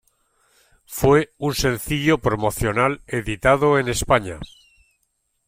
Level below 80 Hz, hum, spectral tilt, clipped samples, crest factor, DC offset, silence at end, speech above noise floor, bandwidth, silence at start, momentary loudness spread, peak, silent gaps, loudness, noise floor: -40 dBFS; none; -5 dB/octave; under 0.1%; 18 dB; under 0.1%; 1 s; 51 dB; 16.5 kHz; 0.9 s; 11 LU; -2 dBFS; none; -20 LUFS; -71 dBFS